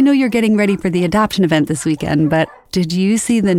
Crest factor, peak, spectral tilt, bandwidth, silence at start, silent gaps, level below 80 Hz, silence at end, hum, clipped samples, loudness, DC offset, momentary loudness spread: 12 dB; -2 dBFS; -5.5 dB/octave; 16 kHz; 0 s; none; -44 dBFS; 0 s; none; under 0.1%; -15 LUFS; under 0.1%; 5 LU